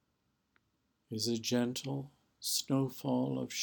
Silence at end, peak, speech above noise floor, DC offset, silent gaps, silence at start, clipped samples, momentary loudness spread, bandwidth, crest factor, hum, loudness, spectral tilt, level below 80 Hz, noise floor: 0 s; -20 dBFS; 45 dB; under 0.1%; none; 1.1 s; under 0.1%; 10 LU; over 20 kHz; 18 dB; none; -35 LUFS; -4.5 dB/octave; -76 dBFS; -80 dBFS